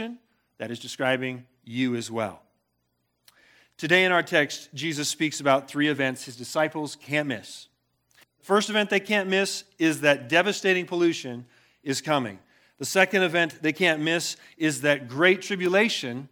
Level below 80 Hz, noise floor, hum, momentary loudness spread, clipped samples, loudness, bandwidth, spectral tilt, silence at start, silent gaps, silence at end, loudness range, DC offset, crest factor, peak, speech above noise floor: -78 dBFS; -75 dBFS; none; 14 LU; under 0.1%; -24 LUFS; 18.5 kHz; -4 dB/octave; 0 s; none; 0.05 s; 4 LU; under 0.1%; 22 dB; -4 dBFS; 50 dB